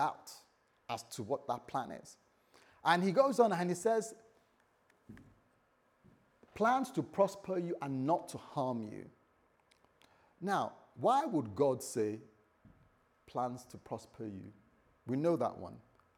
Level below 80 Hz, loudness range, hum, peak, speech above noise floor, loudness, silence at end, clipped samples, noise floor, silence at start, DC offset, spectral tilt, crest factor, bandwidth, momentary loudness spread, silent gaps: -78 dBFS; 6 LU; none; -16 dBFS; 38 dB; -35 LUFS; 0.35 s; under 0.1%; -73 dBFS; 0 s; under 0.1%; -5.5 dB/octave; 22 dB; 18 kHz; 20 LU; none